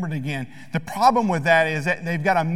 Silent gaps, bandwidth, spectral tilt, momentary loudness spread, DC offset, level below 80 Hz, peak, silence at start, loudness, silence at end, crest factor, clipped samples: none; 16 kHz; -6 dB/octave; 12 LU; 0.8%; -56 dBFS; -4 dBFS; 0 s; -21 LUFS; 0 s; 18 dB; under 0.1%